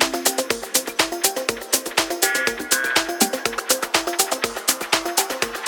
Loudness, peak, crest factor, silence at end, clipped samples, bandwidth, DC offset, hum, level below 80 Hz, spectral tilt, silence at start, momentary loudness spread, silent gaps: -20 LUFS; -2 dBFS; 22 dB; 0 s; under 0.1%; 19 kHz; under 0.1%; none; -54 dBFS; 0 dB/octave; 0 s; 3 LU; none